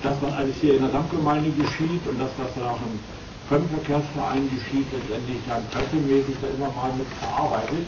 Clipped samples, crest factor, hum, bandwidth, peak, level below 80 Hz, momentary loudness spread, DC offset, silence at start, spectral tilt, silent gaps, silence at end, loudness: under 0.1%; 16 dB; none; 7.4 kHz; -10 dBFS; -44 dBFS; 8 LU; under 0.1%; 0 s; -7 dB/octave; none; 0 s; -25 LUFS